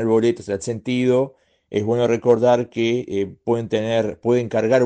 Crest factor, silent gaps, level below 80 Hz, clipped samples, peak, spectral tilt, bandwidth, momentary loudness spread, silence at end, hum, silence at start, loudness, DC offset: 16 dB; none; -58 dBFS; under 0.1%; -4 dBFS; -6.5 dB/octave; 9.4 kHz; 9 LU; 0 s; none; 0 s; -20 LUFS; under 0.1%